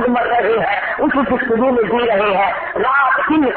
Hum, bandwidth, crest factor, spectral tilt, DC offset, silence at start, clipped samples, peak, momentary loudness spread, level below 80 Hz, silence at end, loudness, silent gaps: none; 4.5 kHz; 10 dB; -10.5 dB/octave; under 0.1%; 0 s; under 0.1%; -4 dBFS; 3 LU; -46 dBFS; 0 s; -15 LUFS; none